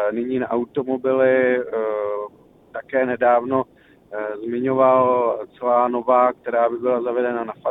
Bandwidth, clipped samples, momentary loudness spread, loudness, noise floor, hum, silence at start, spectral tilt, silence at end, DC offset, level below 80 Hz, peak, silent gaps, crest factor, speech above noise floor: 3.9 kHz; under 0.1%; 12 LU; -20 LUFS; -43 dBFS; none; 0 s; -9.5 dB/octave; 0 s; under 0.1%; -64 dBFS; -4 dBFS; none; 16 dB; 24 dB